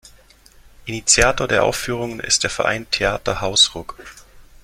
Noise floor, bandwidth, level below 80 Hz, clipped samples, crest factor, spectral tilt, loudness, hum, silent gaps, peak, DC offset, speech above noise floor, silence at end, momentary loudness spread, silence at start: -49 dBFS; 16.5 kHz; -38 dBFS; under 0.1%; 20 dB; -1.5 dB/octave; -17 LUFS; none; none; 0 dBFS; under 0.1%; 30 dB; 0.2 s; 15 LU; 0.8 s